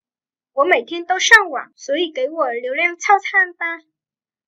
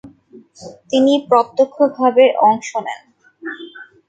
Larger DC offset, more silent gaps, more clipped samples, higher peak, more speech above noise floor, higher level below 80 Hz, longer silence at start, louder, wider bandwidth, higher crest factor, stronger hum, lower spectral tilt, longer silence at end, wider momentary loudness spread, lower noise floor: neither; neither; neither; about the same, 0 dBFS vs 0 dBFS; first, over 73 dB vs 30 dB; about the same, -62 dBFS vs -66 dBFS; first, 0.55 s vs 0.05 s; about the same, -16 LUFS vs -15 LUFS; first, 16 kHz vs 8.8 kHz; about the same, 18 dB vs 16 dB; neither; second, 0.5 dB/octave vs -4.5 dB/octave; first, 0.7 s vs 0.25 s; second, 15 LU vs 21 LU; first, under -90 dBFS vs -44 dBFS